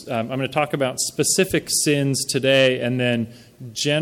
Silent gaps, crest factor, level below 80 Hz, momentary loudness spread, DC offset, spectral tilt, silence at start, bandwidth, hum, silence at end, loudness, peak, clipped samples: none; 16 dB; -56 dBFS; 9 LU; under 0.1%; -3.5 dB/octave; 0 s; 18 kHz; none; 0 s; -20 LUFS; -4 dBFS; under 0.1%